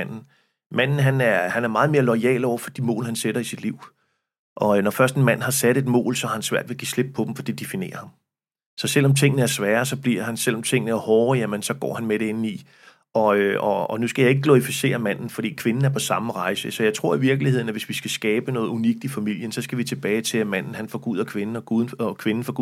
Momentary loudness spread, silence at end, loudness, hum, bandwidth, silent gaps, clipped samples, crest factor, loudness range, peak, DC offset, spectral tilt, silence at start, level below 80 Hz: 10 LU; 0 s; -22 LUFS; none; 16 kHz; 0.66-0.70 s, 4.39-4.56 s, 8.66-8.77 s; under 0.1%; 20 dB; 4 LU; -2 dBFS; under 0.1%; -5 dB/octave; 0 s; -74 dBFS